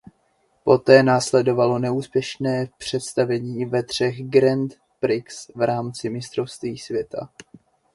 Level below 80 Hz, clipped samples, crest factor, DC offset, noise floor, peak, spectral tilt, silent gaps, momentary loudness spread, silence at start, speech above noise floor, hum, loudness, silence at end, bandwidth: -60 dBFS; under 0.1%; 22 dB; under 0.1%; -65 dBFS; 0 dBFS; -5.5 dB/octave; none; 13 LU; 0.65 s; 44 dB; none; -21 LUFS; 0.7 s; 11.5 kHz